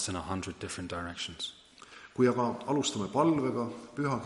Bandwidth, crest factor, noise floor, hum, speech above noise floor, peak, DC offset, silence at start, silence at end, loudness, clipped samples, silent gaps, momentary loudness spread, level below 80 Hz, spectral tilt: 11.5 kHz; 18 dB; -53 dBFS; none; 21 dB; -14 dBFS; under 0.1%; 0 s; 0 s; -32 LUFS; under 0.1%; none; 12 LU; -60 dBFS; -5 dB/octave